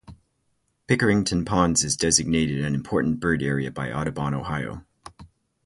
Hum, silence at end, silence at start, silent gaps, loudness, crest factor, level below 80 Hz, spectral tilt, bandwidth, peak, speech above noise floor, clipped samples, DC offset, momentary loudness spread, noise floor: none; 0.4 s; 0.1 s; none; -23 LUFS; 22 dB; -44 dBFS; -4 dB/octave; 11.5 kHz; -2 dBFS; 48 dB; under 0.1%; under 0.1%; 9 LU; -71 dBFS